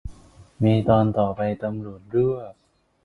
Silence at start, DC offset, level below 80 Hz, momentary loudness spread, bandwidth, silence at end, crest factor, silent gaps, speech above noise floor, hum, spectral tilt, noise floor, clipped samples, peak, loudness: 0.05 s; under 0.1%; -46 dBFS; 15 LU; 4.4 kHz; 0.5 s; 18 dB; none; 27 dB; none; -9.5 dB/octave; -48 dBFS; under 0.1%; -6 dBFS; -23 LUFS